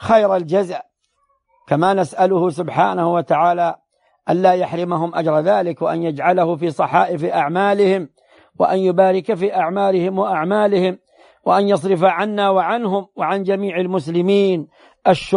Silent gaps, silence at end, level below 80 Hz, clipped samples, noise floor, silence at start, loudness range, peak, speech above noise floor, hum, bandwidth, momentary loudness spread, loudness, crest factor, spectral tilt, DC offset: none; 0 s; -60 dBFS; under 0.1%; -65 dBFS; 0 s; 1 LU; -2 dBFS; 49 dB; none; 10.5 kHz; 6 LU; -17 LUFS; 16 dB; -7 dB/octave; under 0.1%